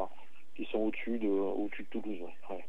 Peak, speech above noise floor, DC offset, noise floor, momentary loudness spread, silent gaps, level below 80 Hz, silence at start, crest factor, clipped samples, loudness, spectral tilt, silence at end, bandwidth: -20 dBFS; 24 dB; 2%; -60 dBFS; 12 LU; none; -80 dBFS; 0 s; 16 dB; under 0.1%; -36 LUFS; -7.5 dB/octave; 0 s; 8.6 kHz